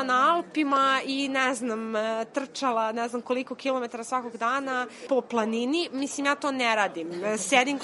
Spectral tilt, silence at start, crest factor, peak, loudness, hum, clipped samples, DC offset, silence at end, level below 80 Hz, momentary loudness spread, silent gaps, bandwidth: -2.5 dB/octave; 0 s; 22 dB; -6 dBFS; -27 LUFS; none; under 0.1%; under 0.1%; 0 s; -82 dBFS; 8 LU; none; 11.5 kHz